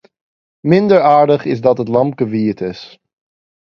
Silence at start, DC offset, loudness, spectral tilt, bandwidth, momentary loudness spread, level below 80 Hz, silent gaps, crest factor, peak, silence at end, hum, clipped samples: 0.65 s; under 0.1%; -13 LUFS; -8.5 dB/octave; 6.8 kHz; 14 LU; -56 dBFS; none; 14 dB; 0 dBFS; 0.9 s; none; under 0.1%